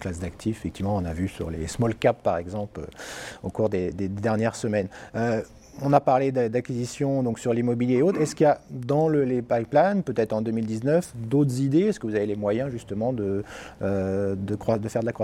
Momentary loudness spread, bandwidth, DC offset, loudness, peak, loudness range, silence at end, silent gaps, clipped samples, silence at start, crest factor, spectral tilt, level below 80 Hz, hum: 10 LU; 15.5 kHz; under 0.1%; -25 LUFS; -4 dBFS; 5 LU; 0 s; none; under 0.1%; 0 s; 22 dB; -7 dB/octave; -50 dBFS; none